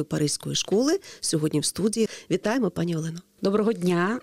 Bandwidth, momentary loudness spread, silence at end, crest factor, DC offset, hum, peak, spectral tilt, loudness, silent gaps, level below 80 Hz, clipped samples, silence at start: 16 kHz; 5 LU; 0 s; 12 dB; 0.1%; none; -12 dBFS; -4.5 dB/octave; -25 LUFS; none; -60 dBFS; under 0.1%; 0 s